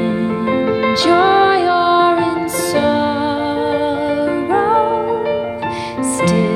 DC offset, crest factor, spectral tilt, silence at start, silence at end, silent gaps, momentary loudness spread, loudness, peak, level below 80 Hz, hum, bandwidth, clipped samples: under 0.1%; 14 dB; -5 dB/octave; 0 s; 0 s; none; 7 LU; -15 LUFS; -2 dBFS; -48 dBFS; none; 16 kHz; under 0.1%